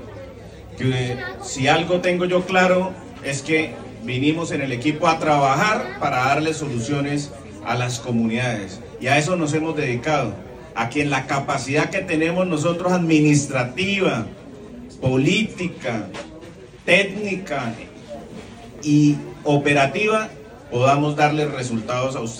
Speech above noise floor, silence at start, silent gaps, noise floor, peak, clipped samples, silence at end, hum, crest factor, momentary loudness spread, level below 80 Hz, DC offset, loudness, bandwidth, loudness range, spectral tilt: 20 dB; 0 s; none; -40 dBFS; -2 dBFS; under 0.1%; 0 s; none; 18 dB; 18 LU; -50 dBFS; under 0.1%; -20 LUFS; 16 kHz; 3 LU; -5.5 dB/octave